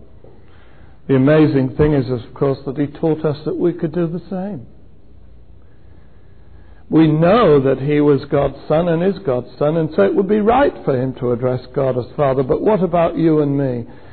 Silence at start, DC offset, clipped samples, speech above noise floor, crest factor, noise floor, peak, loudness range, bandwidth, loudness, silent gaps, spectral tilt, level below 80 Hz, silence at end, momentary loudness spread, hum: 1.1 s; 1%; under 0.1%; 30 dB; 12 dB; -45 dBFS; -4 dBFS; 8 LU; 4.5 kHz; -16 LUFS; none; -12.5 dB/octave; -42 dBFS; 0.15 s; 9 LU; none